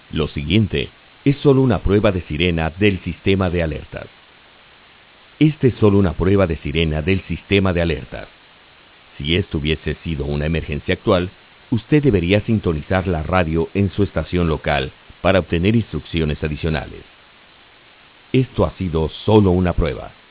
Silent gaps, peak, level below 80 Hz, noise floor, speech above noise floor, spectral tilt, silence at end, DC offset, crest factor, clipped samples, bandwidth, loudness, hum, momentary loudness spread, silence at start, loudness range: none; 0 dBFS; -32 dBFS; -48 dBFS; 30 dB; -11 dB/octave; 0.2 s; under 0.1%; 18 dB; under 0.1%; 4 kHz; -19 LUFS; none; 9 LU; 0.15 s; 4 LU